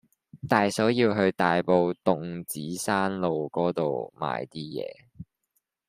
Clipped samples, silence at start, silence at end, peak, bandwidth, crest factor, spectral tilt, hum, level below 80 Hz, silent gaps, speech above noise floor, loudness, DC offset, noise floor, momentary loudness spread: under 0.1%; 0.35 s; 0.65 s; -6 dBFS; 15.5 kHz; 22 dB; -5.5 dB/octave; none; -66 dBFS; none; 51 dB; -26 LUFS; under 0.1%; -77 dBFS; 12 LU